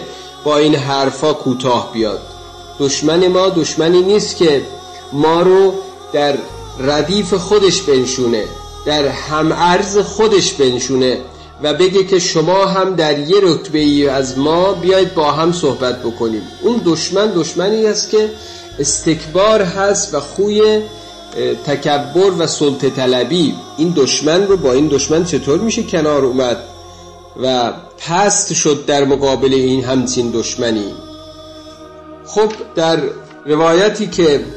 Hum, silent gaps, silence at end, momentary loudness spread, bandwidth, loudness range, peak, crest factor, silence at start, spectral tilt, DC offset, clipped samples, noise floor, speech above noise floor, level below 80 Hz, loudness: none; none; 0 s; 10 LU; 11 kHz; 3 LU; -2 dBFS; 12 dB; 0 s; -4 dB/octave; 0.1%; under 0.1%; -36 dBFS; 22 dB; -42 dBFS; -14 LUFS